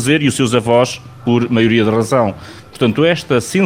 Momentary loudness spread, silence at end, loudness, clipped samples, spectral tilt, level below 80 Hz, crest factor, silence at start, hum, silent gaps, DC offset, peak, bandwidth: 7 LU; 0 s; -14 LUFS; under 0.1%; -5.5 dB/octave; -48 dBFS; 14 dB; 0 s; none; none; under 0.1%; 0 dBFS; 16 kHz